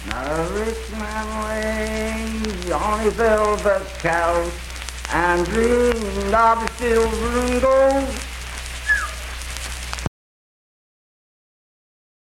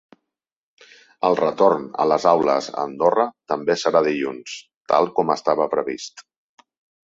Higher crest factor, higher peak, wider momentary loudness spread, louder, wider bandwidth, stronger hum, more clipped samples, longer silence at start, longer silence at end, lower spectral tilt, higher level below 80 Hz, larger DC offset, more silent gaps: about the same, 18 dB vs 22 dB; second, -4 dBFS vs 0 dBFS; about the same, 12 LU vs 12 LU; about the same, -21 LUFS vs -20 LUFS; first, 16.5 kHz vs 7.8 kHz; neither; neither; second, 0 s vs 1.2 s; first, 2.15 s vs 0.85 s; about the same, -4.5 dB/octave vs -5 dB/octave; first, -32 dBFS vs -66 dBFS; neither; second, none vs 4.76-4.85 s